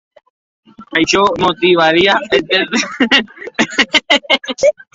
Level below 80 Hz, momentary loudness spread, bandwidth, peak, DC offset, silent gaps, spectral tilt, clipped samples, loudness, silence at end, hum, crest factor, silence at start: -48 dBFS; 6 LU; 8 kHz; 0 dBFS; under 0.1%; none; -3 dB/octave; under 0.1%; -12 LUFS; 0.25 s; none; 14 dB; 0.8 s